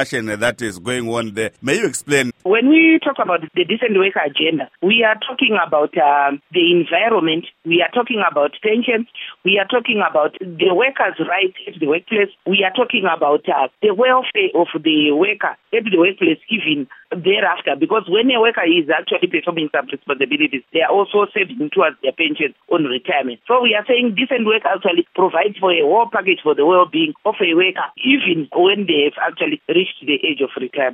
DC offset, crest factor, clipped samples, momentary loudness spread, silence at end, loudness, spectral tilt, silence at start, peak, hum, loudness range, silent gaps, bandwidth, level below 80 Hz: under 0.1%; 16 dB; under 0.1%; 6 LU; 0 s; -16 LUFS; -4.5 dB/octave; 0 s; 0 dBFS; none; 2 LU; none; 13 kHz; -66 dBFS